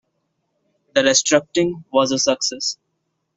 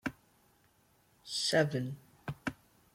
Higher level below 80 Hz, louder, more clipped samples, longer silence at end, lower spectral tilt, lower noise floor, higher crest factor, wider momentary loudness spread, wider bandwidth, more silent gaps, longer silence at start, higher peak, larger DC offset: first, -60 dBFS vs -66 dBFS; first, -18 LUFS vs -35 LUFS; neither; first, 0.65 s vs 0.4 s; second, -2.5 dB/octave vs -4 dB/octave; first, -73 dBFS vs -69 dBFS; about the same, 18 dB vs 22 dB; second, 9 LU vs 16 LU; second, 8.2 kHz vs 16.5 kHz; neither; first, 0.95 s vs 0.05 s; first, -2 dBFS vs -16 dBFS; neither